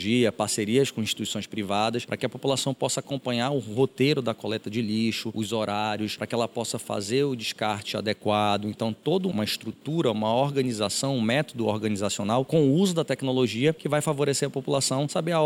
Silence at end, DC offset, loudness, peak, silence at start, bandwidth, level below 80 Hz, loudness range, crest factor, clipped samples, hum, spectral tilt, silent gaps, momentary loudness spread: 0 s; under 0.1%; -26 LUFS; -10 dBFS; 0 s; 17 kHz; -68 dBFS; 3 LU; 16 dB; under 0.1%; none; -4.5 dB/octave; none; 6 LU